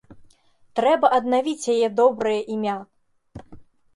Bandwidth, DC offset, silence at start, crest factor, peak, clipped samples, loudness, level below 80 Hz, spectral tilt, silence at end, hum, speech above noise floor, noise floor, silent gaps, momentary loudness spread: 11.5 kHz; under 0.1%; 0.1 s; 18 dB; -4 dBFS; under 0.1%; -21 LUFS; -60 dBFS; -4.5 dB/octave; 0.35 s; none; 36 dB; -56 dBFS; none; 9 LU